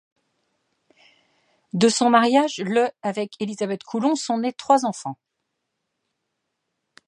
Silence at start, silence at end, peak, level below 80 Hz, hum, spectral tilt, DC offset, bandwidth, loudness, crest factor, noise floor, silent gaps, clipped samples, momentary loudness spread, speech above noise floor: 1.75 s; 1.95 s; -2 dBFS; -76 dBFS; none; -4 dB/octave; under 0.1%; 11.5 kHz; -21 LUFS; 22 dB; -78 dBFS; none; under 0.1%; 13 LU; 57 dB